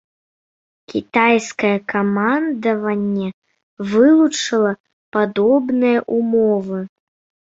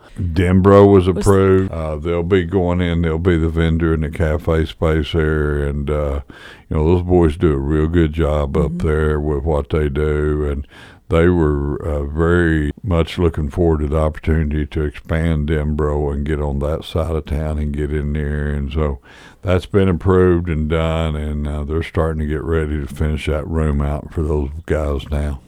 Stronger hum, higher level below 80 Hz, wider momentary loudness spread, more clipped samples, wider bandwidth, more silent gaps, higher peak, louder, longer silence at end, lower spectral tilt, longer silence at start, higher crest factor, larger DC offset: neither; second, -62 dBFS vs -24 dBFS; first, 12 LU vs 8 LU; neither; second, 8 kHz vs 11.5 kHz; first, 3.34-3.42 s, 3.63-3.77 s, 4.80-4.84 s, 4.93-5.12 s vs none; about the same, -2 dBFS vs 0 dBFS; about the same, -17 LUFS vs -18 LUFS; first, 0.6 s vs 0.1 s; second, -5.5 dB/octave vs -8 dB/octave; first, 0.9 s vs 0.15 s; about the same, 16 dB vs 16 dB; neither